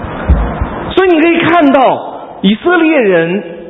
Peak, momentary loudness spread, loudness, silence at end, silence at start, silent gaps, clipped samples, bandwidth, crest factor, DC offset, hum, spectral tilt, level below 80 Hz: 0 dBFS; 9 LU; -10 LUFS; 0 s; 0 s; none; 0.2%; 4 kHz; 10 dB; under 0.1%; none; -9 dB/octave; -22 dBFS